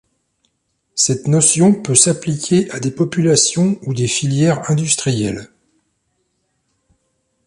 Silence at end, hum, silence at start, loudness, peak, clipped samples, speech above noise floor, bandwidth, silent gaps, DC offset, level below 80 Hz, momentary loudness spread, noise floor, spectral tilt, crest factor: 2 s; none; 0.95 s; -15 LUFS; 0 dBFS; under 0.1%; 53 dB; 11.5 kHz; none; under 0.1%; -52 dBFS; 9 LU; -68 dBFS; -4.5 dB/octave; 18 dB